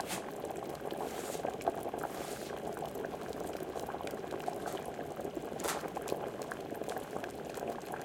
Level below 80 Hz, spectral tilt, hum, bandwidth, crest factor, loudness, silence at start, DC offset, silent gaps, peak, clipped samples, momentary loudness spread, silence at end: -64 dBFS; -4 dB/octave; none; 17 kHz; 24 dB; -40 LUFS; 0 s; under 0.1%; none; -16 dBFS; under 0.1%; 4 LU; 0 s